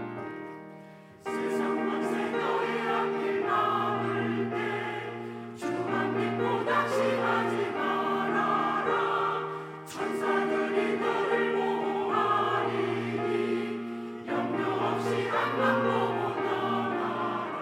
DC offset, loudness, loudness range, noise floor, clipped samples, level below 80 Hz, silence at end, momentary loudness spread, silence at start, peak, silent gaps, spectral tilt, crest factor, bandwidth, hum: under 0.1%; -29 LUFS; 2 LU; -49 dBFS; under 0.1%; -78 dBFS; 0 s; 10 LU; 0 s; -12 dBFS; none; -6 dB/octave; 16 dB; 15.5 kHz; none